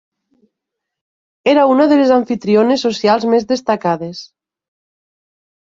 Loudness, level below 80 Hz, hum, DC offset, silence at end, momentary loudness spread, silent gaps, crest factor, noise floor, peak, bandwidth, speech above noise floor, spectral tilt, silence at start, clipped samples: -14 LUFS; -60 dBFS; none; under 0.1%; 1.55 s; 9 LU; none; 14 dB; -79 dBFS; -2 dBFS; 7.8 kHz; 66 dB; -5.5 dB/octave; 1.45 s; under 0.1%